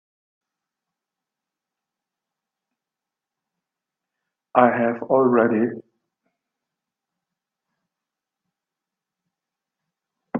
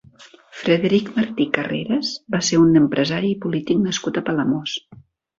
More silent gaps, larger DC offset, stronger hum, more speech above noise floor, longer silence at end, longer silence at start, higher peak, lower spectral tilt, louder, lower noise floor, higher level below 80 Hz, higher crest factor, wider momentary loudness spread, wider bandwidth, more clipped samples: neither; neither; neither; first, 69 dB vs 28 dB; second, 0 s vs 0.45 s; first, 4.55 s vs 0.2 s; about the same, 0 dBFS vs -2 dBFS; first, -10.5 dB/octave vs -5 dB/octave; about the same, -19 LUFS vs -20 LUFS; first, -87 dBFS vs -48 dBFS; second, -74 dBFS vs -56 dBFS; first, 26 dB vs 18 dB; about the same, 8 LU vs 9 LU; second, 3.6 kHz vs 7.8 kHz; neither